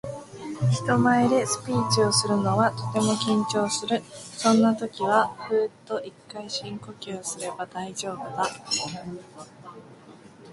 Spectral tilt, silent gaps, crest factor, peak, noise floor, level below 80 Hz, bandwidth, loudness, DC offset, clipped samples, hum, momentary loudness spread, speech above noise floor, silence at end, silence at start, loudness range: -4.5 dB/octave; none; 18 dB; -6 dBFS; -49 dBFS; -62 dBFS; 11.5 kHz; -25 LUFS; under 0.1%; under 0.1%; none; 18 LU; 23 dB; 0 s; 0.05 s; 9 LU